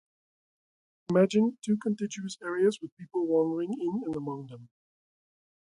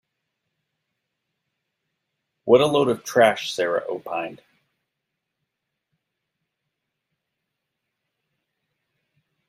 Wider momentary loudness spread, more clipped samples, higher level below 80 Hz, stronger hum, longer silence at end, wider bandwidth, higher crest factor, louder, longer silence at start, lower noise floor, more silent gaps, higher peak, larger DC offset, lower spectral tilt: about the same, 12 LU vs 13 LU; neither; second, -74 dBFS vs -68 dBFS; neither; second, 1 s vs 5.15 s; second, 11.5 kHz vs 15 kHz; second, 18 dB vs 24 dB; second, -29 LUFS vs -21 LUFS; second, 1.1 s vs 2.45 s; first, under -90 dBFS vs -81 dBFS; first, 2.92-2.97 s vs none; second, -12 dBFS vs -2 dBFS; neither; first, -6.5 dB/octave vs -4.5 dB/octave